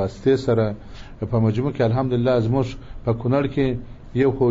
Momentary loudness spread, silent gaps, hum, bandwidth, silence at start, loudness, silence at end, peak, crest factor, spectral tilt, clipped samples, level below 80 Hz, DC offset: 10 LU; none; none; 7.6 kHz; 0 s; -22 LUFS; 0 s; -8 dBFS; 14 dB; -7.5 dB/octave; under 0.1%; -40 dBFS; under 0.1%